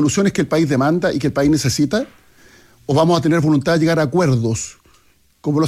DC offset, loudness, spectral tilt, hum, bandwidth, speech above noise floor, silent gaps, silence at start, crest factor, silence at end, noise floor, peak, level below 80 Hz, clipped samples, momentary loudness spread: under 0.1%; -17 LUFS; -6 dB/octave; none; 14.5 kHz; 39 dB; none; 0 s; 12 dB; 0 s; -55 dBFS; -4 dBFS; -46 dBFS; under 0.1%; 9 LU